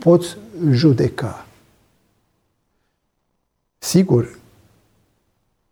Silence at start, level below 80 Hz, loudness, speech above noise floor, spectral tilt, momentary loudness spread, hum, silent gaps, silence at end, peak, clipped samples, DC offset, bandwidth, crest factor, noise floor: 0 s; -54 dBFS; -18 LUFS; 55 dB; -6.5 dB/octave; 15 LU; none; none; 1.4 s; -2 dBFS; under 0.1%; under 0.1%; 20 kHz; 20 dB; -71 dBFS